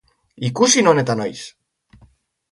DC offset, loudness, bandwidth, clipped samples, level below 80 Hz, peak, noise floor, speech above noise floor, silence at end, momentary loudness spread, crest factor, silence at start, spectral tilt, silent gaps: under 0.1%; -17 LUFS; 11.5 kHz; under 0.1%; -60 dBFS; 0 dBFS; -55 dBFS; 38 dB; 1.05 s; 20 LU; 20 dB; 0.4 s; -3.5 dB/octave; none